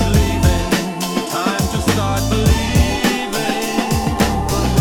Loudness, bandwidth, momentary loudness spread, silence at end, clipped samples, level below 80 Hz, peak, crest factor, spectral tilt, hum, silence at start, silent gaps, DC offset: -17 LUFS; 18 kHz; 4 LU; 0 s; under 0.1%; -24 dBFS; -2 dBFS; 14 dB; -5 dB/octave; none; 0 s; none; under 0.1%